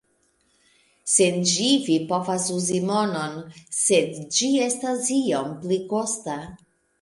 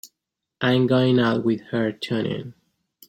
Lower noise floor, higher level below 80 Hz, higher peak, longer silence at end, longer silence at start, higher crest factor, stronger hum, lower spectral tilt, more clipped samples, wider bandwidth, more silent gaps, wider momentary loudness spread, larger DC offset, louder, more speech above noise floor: second, -66 dBFS vs -82 dBFS; about the same, -64 dBFS vs -62 dBFS; about the same, -4 dBFS vs -6 dBFS; about the same, 0.45 s vs 0.55 s; first, 1.05 s vs 0.05 s; about the same, 20 dB vs 16 dB; neither; second, -3.5 dB/octave vs -7 dB/octave; neither; second, 11.5 kHz vs 16.5 kHz; neither; about the same, 12 LU vs 10 LU; neither; about the same, -22 LUFS vs -22 LUFS; second, 43 dB vs 61 dB